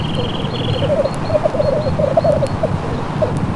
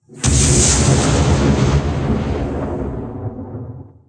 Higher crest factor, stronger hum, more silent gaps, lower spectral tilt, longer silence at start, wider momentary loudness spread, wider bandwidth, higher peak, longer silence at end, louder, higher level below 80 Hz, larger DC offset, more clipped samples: about the same, 14 dB vs 14 dB; neither; neither; first, -7 dB/octave vs -4.5 dB/octave; about the same, 0 s vs 0.1 s; second, 5 LU vs 17 LU; about the same, 11.5 kHz vs 10.5 kHz; about the same, -2 dBFS vs -2 dBFS; second, 0 s vs 0.2 s; about the same, -18 LUFS vs -16 LUFS; second, -34 dBFS vs -24 dBFS; neither; neither